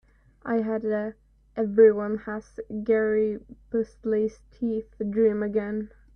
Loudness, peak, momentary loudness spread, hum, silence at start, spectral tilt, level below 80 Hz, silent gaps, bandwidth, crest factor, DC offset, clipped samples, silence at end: -26 LUFS; -8 dBFS; 17 LU; none; 0.45 s; -9 dB/octave; -56 dBFS; none; 6.4 kHz; 18 dB; under 0.1%; under 0.1%; 0.3 s